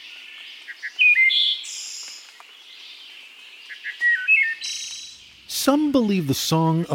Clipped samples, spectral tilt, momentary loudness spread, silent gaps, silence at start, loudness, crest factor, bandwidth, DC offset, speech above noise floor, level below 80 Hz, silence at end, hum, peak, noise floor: under 0.1%; -3.5 dB/octave; 24 LU; none; 0 s; -19 LUFS; 18 dB; 17 kHz; under 0.1%; 26 dB; -62 dBFS; 0 s; none; -6 dBFS; -45 dBFS